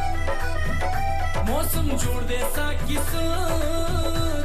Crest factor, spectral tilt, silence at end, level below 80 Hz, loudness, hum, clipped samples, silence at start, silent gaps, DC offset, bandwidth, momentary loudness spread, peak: 10 dB; -4.5 dB/octave; 0 s; -24 dBFS; -26 LUFS; none; under 0.1%; 0 s; none; under 0.1%; 14 kHz; 3 LU; -12 dBFS